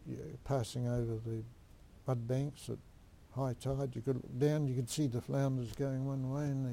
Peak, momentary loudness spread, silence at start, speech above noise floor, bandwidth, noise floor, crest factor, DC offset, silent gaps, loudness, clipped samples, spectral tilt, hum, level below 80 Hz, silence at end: -20 dBFS; 12 LU; 0 s; 22 dB; 16 kHz; -58 dBFS; 16 dB; under 0.1%; none; -37 LUFS; under 0.1%; -7 dB/octave; none; -58 dBFS; 0 s